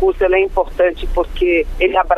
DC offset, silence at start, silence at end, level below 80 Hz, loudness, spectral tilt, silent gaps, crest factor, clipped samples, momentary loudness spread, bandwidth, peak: under 0.1%; 0 s; 0 s; -26 dBFS; -16 LUFS; -6.5 dB/octave; none; 12 dB; under 0.1%; 5 LU; 6.4 kHz; -2 dBFS